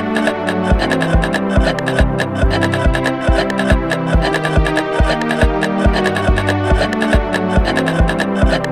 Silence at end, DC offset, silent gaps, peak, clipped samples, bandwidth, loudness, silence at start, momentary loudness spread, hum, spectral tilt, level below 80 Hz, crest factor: 0 s; under 0.1%; none; 0 dBFS; under 0.1%; 13.5 kHz; -15 LUFS; 0 s; 1 LU; none; -6 dB/octave; -20 dBFS; 14 dB